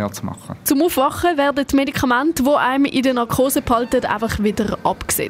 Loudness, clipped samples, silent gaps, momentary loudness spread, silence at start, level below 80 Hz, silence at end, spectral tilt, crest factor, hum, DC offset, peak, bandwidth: -18 LUFS; under 0.1%; none; 5 LU; 0 s; -42 dBFS; 0 s; -4.5 dB/octave; 14 dB; none; under 0.1%; -4 dBFS; 16 kHz